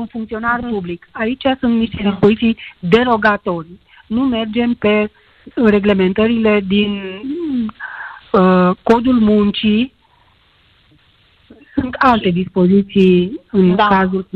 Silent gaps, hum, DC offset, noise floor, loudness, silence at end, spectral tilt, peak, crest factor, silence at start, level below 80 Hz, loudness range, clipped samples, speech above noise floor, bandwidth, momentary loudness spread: none; none; under 0.1%; -53 dBFS; -15 LUFS; 0.15 s; -8.5 dB/octave; 0 dBFS; 14 dB; 0 s; -42 dBFS; 3 LU; under 0.1%; 39 dB; 5.8 kHz; 12 LU